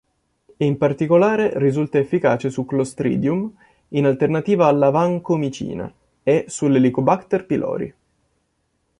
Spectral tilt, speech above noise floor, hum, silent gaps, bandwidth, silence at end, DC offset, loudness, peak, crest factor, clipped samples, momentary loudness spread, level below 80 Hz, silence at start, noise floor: -7.5 dB/octave; 51 dB; none; none; 11.5 kHz; 1.1 s; under 0.1%; -19 LUFS; -2 dBFS; 18 dB; under 0.1%; 10 LU; -56 dBFS; 0.6 s; -69 dBFS